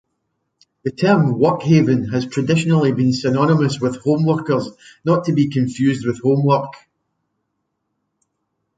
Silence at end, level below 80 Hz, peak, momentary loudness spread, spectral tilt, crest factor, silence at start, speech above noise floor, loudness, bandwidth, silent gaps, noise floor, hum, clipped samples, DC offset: 2 s; -56 dBFS; -2 dBFS; 7 LU; -7.5 dB/octave; 16 dB; 0.85 s; 57 dB; -17 LUFS; 9.2 kHz; none; -74 dBFS; none; under 0.1%; under 0.1%